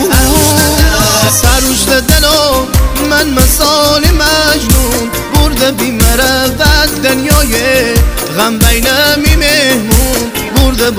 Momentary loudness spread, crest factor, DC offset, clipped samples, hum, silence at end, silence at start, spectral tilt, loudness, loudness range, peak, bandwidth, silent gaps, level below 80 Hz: 4 LU; 8 dB; under 0.1%; 0.8%; none; 0 s; 0 s; -3.5 dB/octave; -8 LUFS; 1 LU; 0 dBFS; 20 kHz; none; -14 dBFS